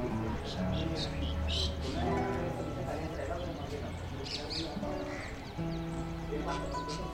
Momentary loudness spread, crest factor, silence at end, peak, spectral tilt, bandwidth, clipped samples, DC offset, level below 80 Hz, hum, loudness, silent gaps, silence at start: 7 LU; 16 dB; 0 s; -20 dBFS; -5.5 dB/octave; 16 kHz; under 0.1%; under 0.1%; -42 dBFS; none; -36 LUFS; none; 0 s